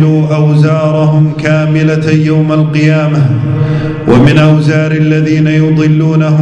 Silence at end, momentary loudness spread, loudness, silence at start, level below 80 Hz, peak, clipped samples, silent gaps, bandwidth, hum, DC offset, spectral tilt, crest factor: 0 s; 4 LU; -9 LUFS; 0 s; -36 dBFS; 0 dBFS; 2%; none; 7.8 kHz; none; under 0.1%; -8 dB/octave; 8 dB